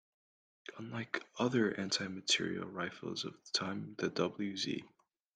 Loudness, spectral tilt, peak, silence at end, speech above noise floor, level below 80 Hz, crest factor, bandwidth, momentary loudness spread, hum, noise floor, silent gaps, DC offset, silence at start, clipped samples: -37 LUFS; -3.5 dB/octave; -18 dBFS; 0.5 s; over 53 dB; -78 dBFS; 20 dB; 10 kHz; 11 LU; none; under -90 dBFS; none; under 0.1%; 0.65 s; under 0.1%